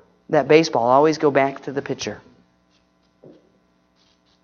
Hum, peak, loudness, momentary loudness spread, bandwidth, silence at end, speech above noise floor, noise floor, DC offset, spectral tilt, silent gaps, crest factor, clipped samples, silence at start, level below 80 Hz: none; 0 dBFS; -19 LUFS; 13 LU; 7 kHz; 2.25 s; 44 dB; -62 dBFS; under 0.1%; -5 dB/octave; none; 22 dB; under 0.1%; 0.3 s; -64 dBFS